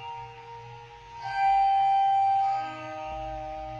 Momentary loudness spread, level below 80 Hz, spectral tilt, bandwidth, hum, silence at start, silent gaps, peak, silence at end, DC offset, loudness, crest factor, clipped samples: 21 LU; -52 dBFS; -4.5 dB/octave; 7.4 kHz; none; 0 s; none; -16 dBFS; 0 s; under 0.1%; -26 LUFS; 12 dB; under 0.1%